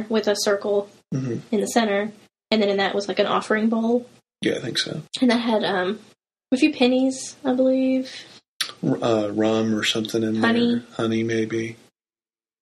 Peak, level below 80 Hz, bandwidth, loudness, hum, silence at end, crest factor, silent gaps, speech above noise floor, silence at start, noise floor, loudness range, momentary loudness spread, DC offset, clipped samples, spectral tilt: -4 dBFS; -66 dBFS; 13.5 kHz; -22 LUFS; none; 0.85 s; 18 dB; 8.48-8.60 s; over 68 dB; 0 s; under -90 dBFS; 1 LU; 9 LU; under 0.1%; under 0.1%; -4.5 dB/octave